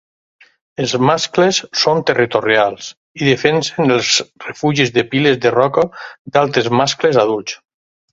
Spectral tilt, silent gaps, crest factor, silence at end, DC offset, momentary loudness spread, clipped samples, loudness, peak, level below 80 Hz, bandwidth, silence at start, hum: -4 dB/octave; 2.97-3.15 s, 6.19-6.25 s; 16 dB; 0.55 s; under 0.1%; 9 LU; under 0.1%; -15 LUFS; 0 dBFS; -54 dBFS; 8 kHz; 0.8 s; none